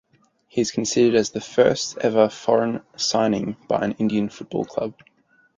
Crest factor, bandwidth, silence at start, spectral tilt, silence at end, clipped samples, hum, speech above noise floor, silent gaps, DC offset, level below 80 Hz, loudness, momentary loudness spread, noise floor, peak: 20 dB; 9.4 kHz; 0.55 s; -4.5 dB/octave; 0.65 s; under 0.1%; none; 40 dB; none; under 0.1%; -60 dBFS; -22 LUFS; 9 LU; -61 dBFS; -2 dBFS